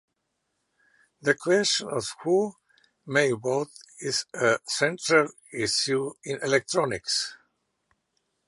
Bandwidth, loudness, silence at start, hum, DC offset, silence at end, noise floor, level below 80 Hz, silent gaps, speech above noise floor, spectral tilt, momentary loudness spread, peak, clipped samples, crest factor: 11.5 kHz; -26 LUFS; 1.25 s; none; under 0.1%; 1.15 s; -78 dBFS; -68 dBFS; none; 53 dB; -3 dB/octave; 9 LU; -6 dBFS; under 0.1%; 22 dB